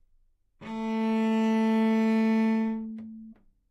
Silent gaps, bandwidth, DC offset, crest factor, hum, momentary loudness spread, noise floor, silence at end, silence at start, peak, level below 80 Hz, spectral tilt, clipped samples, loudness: none; 8 kHz; under 0.1%; 10 dB; none; 18 LU; -65 dBFS; 0.4 s; 0.6 s; -18 dBFS; -66 dBFS; -7 dB/octave; under 0.1%; -26 LUFS